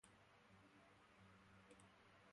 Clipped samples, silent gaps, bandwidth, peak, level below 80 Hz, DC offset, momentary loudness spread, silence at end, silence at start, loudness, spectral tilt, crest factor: under 0.1%; none; 11 kHz; -48 dBFS; -86 dBFS; under 0.1%; 2 LU; 0 s; 0.05 s; -69 LUFS; -4 dB/octave; 22 dB